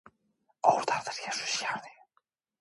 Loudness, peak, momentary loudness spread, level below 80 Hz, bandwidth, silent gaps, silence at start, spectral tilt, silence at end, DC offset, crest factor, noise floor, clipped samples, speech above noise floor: -30 LUFS; -8 dBFS; 9 LU; -80 dBFS; 11.5 kHz; none; 0.65 s; -1.5 dB/octave; 0.7 s; under 0.1%; 24 dB; -75 dBFS; under 0.1%; 45 dB